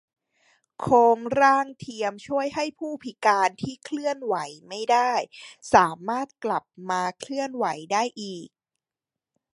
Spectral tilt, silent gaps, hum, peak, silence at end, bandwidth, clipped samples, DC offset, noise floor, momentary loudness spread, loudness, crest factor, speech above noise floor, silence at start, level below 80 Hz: -4 dB/octave; none; none; -2 dBFS; 1.05 s; 11.5 kHz; under 0.1%; under 0.1%; -90 dBFS; 15 LU; -24 LUFS; 22 dB; 65 dB; 0.8 s; -64 dBFS